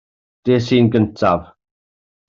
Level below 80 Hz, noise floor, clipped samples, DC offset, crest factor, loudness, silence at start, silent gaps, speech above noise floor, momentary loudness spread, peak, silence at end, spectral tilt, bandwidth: -50 dBFS; under -90 dBFS; under 0.1%; under 0.1%; 16 dB; -17 LUFS; 0.45 s; none; over 75 dB; 8 LU; -2 dBFS; 0.85 s; -7.5 dB/octave; 7.4 kHz